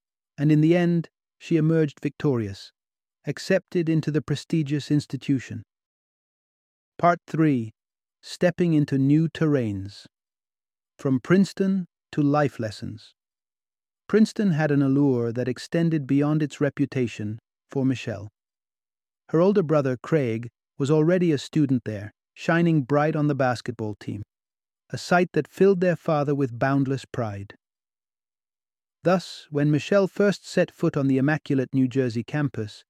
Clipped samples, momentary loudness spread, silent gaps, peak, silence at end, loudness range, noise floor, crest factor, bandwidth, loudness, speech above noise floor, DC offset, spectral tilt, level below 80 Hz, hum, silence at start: under 0.1%; 14 LU; 5.86-6.92 s; -6 dBFS; 0.15 s; 4 LU; under -90 dBFS; 18 dB; 11 kHz; -24 LUFS; over 67 dB; under 0.1%; -7.5 dB/octave; -66 dBFS; none; 0.4 s